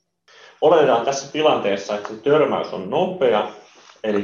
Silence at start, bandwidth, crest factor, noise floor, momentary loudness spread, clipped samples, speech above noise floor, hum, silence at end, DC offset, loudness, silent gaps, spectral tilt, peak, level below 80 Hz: 0.6 s; 7.4 kHz; 16 dB; -50 dBFS; 9 LU; under 0.1%; 31 dB; none; 0 s; under 0.1%; -19 LUFS; none; -4.5 dB/octave; -4 dBFS; -66 dBFS